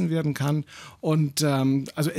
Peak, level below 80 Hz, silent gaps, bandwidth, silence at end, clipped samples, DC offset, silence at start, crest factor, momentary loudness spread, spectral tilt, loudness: -10 dBFS; -64 dBFS; none; 16 kHz; 0 s; under 0.1%; under 0.1%; 0 s; 14 dB; 8 LU; -6 dB/octave; -25 LUFS